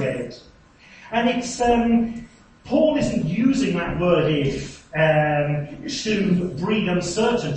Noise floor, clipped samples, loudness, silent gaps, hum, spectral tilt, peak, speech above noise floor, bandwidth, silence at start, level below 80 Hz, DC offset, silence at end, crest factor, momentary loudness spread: -50 dBFS; under 0.1%; -21 LUFS; none; none; -6 dB/octave; -6 dBFS; 29 dB; 8.8 kHz; 0 s; -44 dBFS; under 0.1%; 0 s; 16 dB; 10 LU